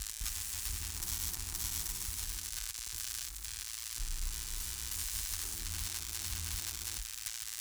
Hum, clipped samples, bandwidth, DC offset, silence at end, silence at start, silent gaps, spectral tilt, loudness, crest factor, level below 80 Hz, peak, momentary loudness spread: none; under 0.1%; over 20 kHz; under 0.1%; 0 s; 0 s; none; -0.5 dB/octave; -37 LUFS; 22 dB; -46 dBFS; -16 dBFS; 4 LU